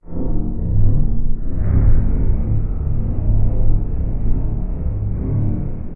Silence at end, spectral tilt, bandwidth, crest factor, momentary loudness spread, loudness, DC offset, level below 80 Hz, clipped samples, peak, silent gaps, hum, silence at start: 0 s; -15 dB/octave; 2.1 kHz; 10 dB; 7 LU; -21 LUFS; under 0.1%; -18 dBFS; under 0.1%; -4 dBFS; none; none; 0.05 s